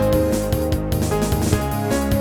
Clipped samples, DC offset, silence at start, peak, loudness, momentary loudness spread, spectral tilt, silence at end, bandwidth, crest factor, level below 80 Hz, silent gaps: under 0.1%; under 0.1%; 0 s; -2 dBFS; -20 LUFS; 2 LU; -6 dB/octave; 0 s; 19 kHz; 16 dB; -28 dBFS; none